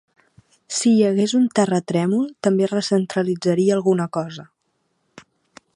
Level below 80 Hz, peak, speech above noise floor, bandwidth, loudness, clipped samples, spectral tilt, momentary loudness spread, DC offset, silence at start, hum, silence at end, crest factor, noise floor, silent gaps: -68 dBFS; -2 dBFS; 52 dB; 11.5 kHz; -19 LUFS; under 0.1%; -5.5 dB/octave; 9 LU; under 0.1%; 0.7 s; none; 1.35 s; 18 dB; -70 dBFS; none